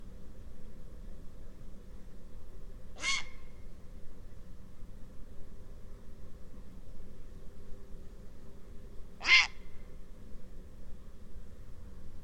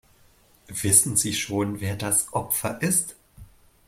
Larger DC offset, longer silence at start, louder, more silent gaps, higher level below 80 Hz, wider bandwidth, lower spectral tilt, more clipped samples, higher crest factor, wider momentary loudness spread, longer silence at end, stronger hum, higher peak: neither; second, 0 s vs 0.7 s; second, -28 LUFS vs -22 LUFS; neither; first, -48 dBFS vs -56 dBFS; second, 10.5 kHz vs 16.5 kHz; second, -1.5 dB/octave vs -3 dB/octave; neither; about the same, 26 dB vs 24 dB; first, 21 LU vs 12 LU; second, 0 s vs 0.4 s; neither; second, -10 dBFS vs -2 dBFS